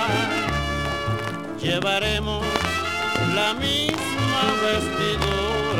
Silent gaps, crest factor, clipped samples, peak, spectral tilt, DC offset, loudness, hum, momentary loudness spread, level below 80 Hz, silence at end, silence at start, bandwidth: none; 22 dB; under 0.1%; 0 dBFS; -4 dB/octave; 0.4%; -23 LUFS; none; 4 LU; -38 dBFS; 0 s; 0 s; 16.5 kHz